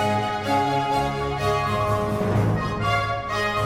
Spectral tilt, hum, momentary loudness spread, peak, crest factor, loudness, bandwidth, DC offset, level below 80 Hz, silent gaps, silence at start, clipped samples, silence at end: -6 dB/octave; none; 2 LU; -10 dBFS; 14 dB; -23 LUFS; 16 kHz; under 0.1%; -40 dBFS; none; 0 s; under 0.1%; 0 s